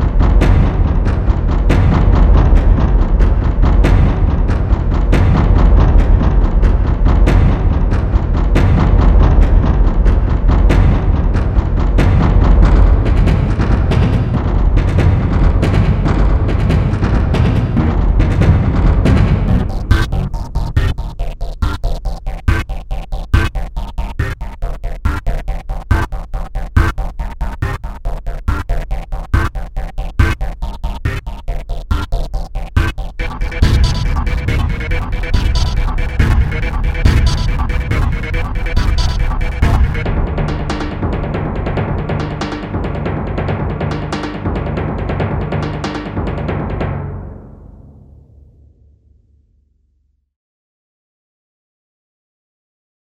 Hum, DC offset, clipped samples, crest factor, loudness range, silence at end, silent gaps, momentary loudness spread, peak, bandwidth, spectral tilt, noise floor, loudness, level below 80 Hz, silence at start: none; under 0.1%; under 0.1%; 12 dB; 8 LU; 5.45 s; none; 13 LU; 0 dBFS; 8.6 kHz; -7.5 dB/octave; -60 dBFS; -16 LUFS; -14 dBFS; 0 s